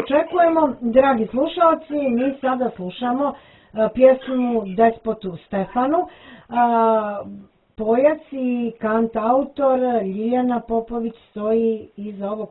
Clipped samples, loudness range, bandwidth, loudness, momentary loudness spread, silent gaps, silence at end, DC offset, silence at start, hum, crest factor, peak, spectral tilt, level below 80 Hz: under 0.1%; 2 LU; 4.1 kHz; -20 LUFS; 12 LU; none; 0 s; under 0.1%; 0 s; none; 18 dB; -2 dBFS; -10.5 dB/octave; -52 dBFS